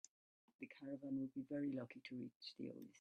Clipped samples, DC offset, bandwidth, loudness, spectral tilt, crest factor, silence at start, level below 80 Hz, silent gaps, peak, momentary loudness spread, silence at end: under 0.1%; under 0.1%; 11 kHz; -50 LUFS; -6 dB/octave; 14 dB; 0.6 s; -90 dBFS; 2.35-2.41 s; -36 dBFS; 11 LU; 0 s